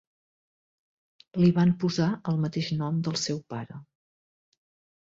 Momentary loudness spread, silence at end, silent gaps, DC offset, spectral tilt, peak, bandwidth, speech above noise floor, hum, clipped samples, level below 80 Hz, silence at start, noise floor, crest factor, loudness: 16 LU; 1.25 s; none; under 0.1%; -6 dB/octave; -12 dBFS; 7.6 kHz; over 64 dB; none; under 0.1%; -60 dBFS; 1.35 s; under -90 dBFS; 18 dB; -27 LUFS